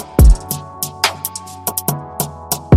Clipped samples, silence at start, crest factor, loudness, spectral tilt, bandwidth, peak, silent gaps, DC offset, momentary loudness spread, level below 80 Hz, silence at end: under 0.1%; 0 s; 14 dB; -18 LUFS; -4.5 dB/octave; 16.5 kHz; 0 dBFS; none; under 0.1%; 13 LU; -18 dBFS; 0 s